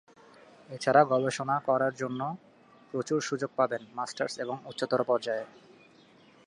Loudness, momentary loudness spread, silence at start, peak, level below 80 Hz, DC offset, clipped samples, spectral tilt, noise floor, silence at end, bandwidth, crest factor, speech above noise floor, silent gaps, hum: -30 LUFS; 13 LU; 0.7 s; -8 dBFS; -78 dBFS; under 0.1%; under 0.1%; -5 dB/octave; -58 dBFS; 0.95 s; 11.5 kHz; 22 dB; 29 dB; none; none